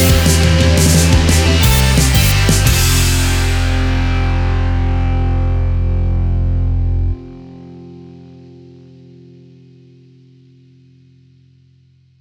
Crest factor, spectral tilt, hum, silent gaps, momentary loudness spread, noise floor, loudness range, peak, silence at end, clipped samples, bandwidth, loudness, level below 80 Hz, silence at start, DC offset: 14 dB; -4.5 dB/octave; none; none; 13 LU; -50 dBFS; 12 LU; 0 dBFS; 3.95 s; under 0.1%; over 20 kHz; -13 LUFS; -18 dBFS; 0 s; under 0.1%